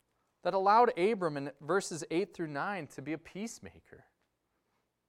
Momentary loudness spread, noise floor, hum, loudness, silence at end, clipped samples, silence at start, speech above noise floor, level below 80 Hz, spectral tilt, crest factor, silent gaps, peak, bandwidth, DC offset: 16 LU; -80 dBFS; none; -32 LUFS; 1.1 s; under 0.1%; 0.45 s; 48 dB; -76 dBFS; -5 dB/octave; 20 dB; none; -14 dBFS; 14 kHz; under 0.1%